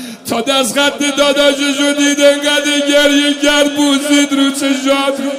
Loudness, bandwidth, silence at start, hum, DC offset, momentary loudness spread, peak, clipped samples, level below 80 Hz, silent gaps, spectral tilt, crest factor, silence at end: -11 LUFS; 16 kHz; 0 s; none; under 0.1%; 4 LU; 0 dBFS; under 0.1%; -50 dBFS; none; -1.5 dB/octave; 12 dB; 0 s